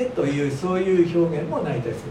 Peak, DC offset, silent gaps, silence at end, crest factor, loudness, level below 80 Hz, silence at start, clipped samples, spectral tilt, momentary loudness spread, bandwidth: -8 dBFS; under 0.1%; none; 0 s; 14 dB; -22 LUFS; -52 dBFS; 0 s; under 0.1%; -7.5 dB/octave; 6 LU; 11 kHz